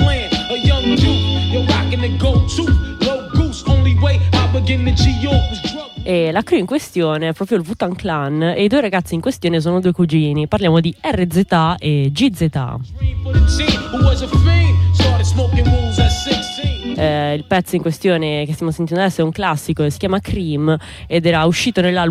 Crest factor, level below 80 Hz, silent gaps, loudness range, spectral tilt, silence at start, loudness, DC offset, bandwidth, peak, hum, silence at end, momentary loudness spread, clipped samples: 12 dB; -24 dBFS; none; 3 LU; -6 dB/octave; 0 s; -16 LUFS; under 0.1%; 13.5 kHz; -2 dBFS; none; 0 s; 6 LU; under 0.1%